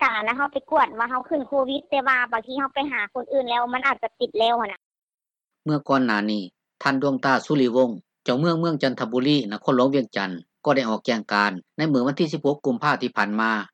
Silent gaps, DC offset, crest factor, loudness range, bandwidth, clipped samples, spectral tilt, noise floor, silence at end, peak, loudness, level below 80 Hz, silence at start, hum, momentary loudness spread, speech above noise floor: 4.86-4.91 s, 5.03-5.07 s; under 0.1%; 18 dB; 3 LU; 8.6 kHz; under 0.1%; -6 dB/octave; under -90 dBFS; 0.1 s; -6 dBFS; -23 LUFS; -68 dBFS; 0 s; none; 6 LU; over 67 dB